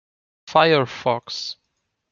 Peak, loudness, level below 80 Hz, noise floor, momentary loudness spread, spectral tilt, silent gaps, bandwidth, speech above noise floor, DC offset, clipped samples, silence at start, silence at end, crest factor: -2 dBFS; -20 LUFS; -66 dBFS; -75 dBFS; 15 LU; -5 dB/octave; none; 7.2 kHz; 56 dB; under 0.1%; under 0.1%; 0.45 s; 0.6 s; 20 dB